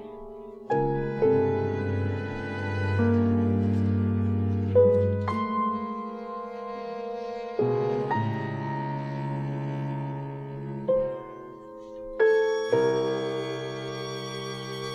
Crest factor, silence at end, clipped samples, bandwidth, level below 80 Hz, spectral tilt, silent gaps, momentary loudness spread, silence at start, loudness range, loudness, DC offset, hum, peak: 18 dB; 0 s; under 0.1%; 9.4 kHz; -54 dBFS; -8 dB/octave; none; 13 LU; 0 s; 6 LU; -27 LUFS; under 0.1%; none; -10 dBFS